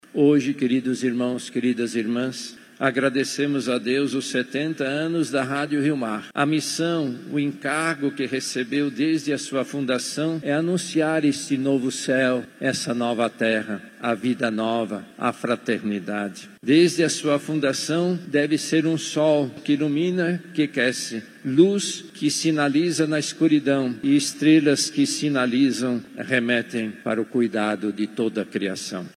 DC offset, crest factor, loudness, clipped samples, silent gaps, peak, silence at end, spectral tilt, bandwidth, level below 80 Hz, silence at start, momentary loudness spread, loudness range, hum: under 0.1%; 18 dB; -23 LUFS; under 0.1%; none; -4 dBFS; 0.1 s; -4.5 dB/octave; 14 kHz; -76 dBFS; 0.15 s; 8 LU; 4 LU; none